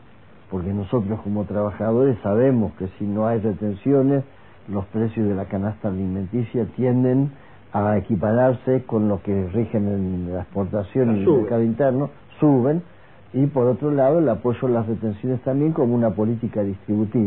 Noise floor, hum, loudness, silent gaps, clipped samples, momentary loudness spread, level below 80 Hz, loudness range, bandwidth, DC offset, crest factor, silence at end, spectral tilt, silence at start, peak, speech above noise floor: -49 dBFS; none; -22 LUFS; none; under 0.1%; 8 LU; -52 dBFS; 3 LU; 4 kHz; 0.4%; 14 dB; 0 s; -13.5 dB/octave; 0.5 s; -6 dBFS; 29 dB